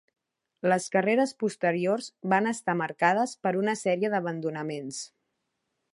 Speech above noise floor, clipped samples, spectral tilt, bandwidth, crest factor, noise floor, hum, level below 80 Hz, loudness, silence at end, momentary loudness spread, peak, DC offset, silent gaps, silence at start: 53 dB; under 0.1%; -5 dB/octave; 11.5 kHz; 20 dB; -80 dBFS; none; -80 dBFS; -27 LUFS; 0.85 s; 10 LU; -8 dBFS; under 0.1%; none; 0.65 s